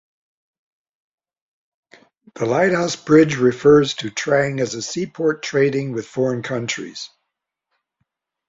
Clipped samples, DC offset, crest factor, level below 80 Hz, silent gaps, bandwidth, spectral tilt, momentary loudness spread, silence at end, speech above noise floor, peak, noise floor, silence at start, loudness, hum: under 0.1%; under 0.1%; 20 dB; -58 dBFS; none; 7.8 kHz; -5 dB/octave; 12 LU; 1.45 s; 61 dB; -2 dBFS; -79 dBFS; 2.35 s; -19 LUFS; none